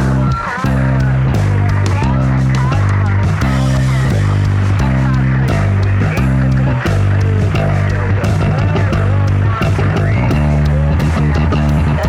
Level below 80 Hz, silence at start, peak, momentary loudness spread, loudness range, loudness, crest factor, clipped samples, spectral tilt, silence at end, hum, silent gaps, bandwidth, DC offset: -22 dBFS; 0 s; -2 dBFS; 1 LU; 0 LU; -14 LUFS; 10 dB; under 0.1%; -7.5 dB/octave; 0 s; none; none; 11 kHz; under 0.1%